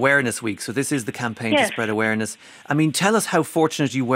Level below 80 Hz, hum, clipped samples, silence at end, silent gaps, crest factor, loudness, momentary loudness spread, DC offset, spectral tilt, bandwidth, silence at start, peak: -66 dBFS; none; under 0.1%; 0 s; none; 18 dB; -21 LUFS; 8 LU; under 0.1%; -4.5 dB/octave; 16 kHz; 0 s; -2 dBFS